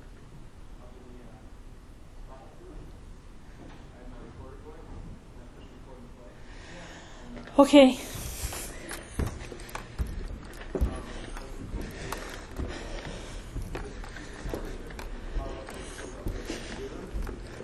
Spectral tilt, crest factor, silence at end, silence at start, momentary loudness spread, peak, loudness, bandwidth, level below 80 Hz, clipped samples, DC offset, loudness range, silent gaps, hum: -5 dB/octave; 28 dB; 0 s; 0 s; 17 LU; -4 dBFS; -31 LUFS; 14 kHz; -40 dBFS; under 0.1%; under 0.1%; 23 LU; none; none